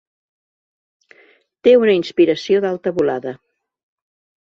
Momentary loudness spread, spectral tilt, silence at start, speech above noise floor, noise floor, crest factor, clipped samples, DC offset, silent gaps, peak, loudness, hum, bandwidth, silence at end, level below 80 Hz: 8 LU; -6 dB/octave; 1.65 s; 38 dB; -54 dBFS; 18 dB; under 0.1%; under 0.1%; none; -2 dBFS; -16 LUFS; none; 7.4 kHz; 1.05 s; -62 dBFS